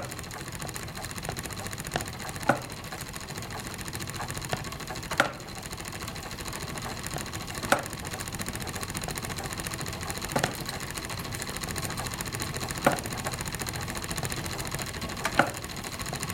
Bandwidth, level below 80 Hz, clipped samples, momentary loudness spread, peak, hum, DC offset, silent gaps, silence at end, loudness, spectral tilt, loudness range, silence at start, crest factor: 17 kHz; -48 dBFS; under 0.1%; 9 LU; -4 dBFS; none; under 0.1%; none; 0 s; -32 LUFS; -3.5 dB/octave; 2 LU; 0 s; 30 dB